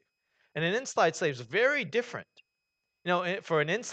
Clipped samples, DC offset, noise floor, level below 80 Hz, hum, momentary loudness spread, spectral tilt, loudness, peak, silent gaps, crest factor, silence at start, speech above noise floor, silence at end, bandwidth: under 0.1%; under 0.1%; -84 dBFS; -82 dBFS; none; 13 LU; -4 dB/octave; -29 LUFS; -12 dBFS; none; 18 dB; 0.55 s; 54 dB; 0 s; 9 kHz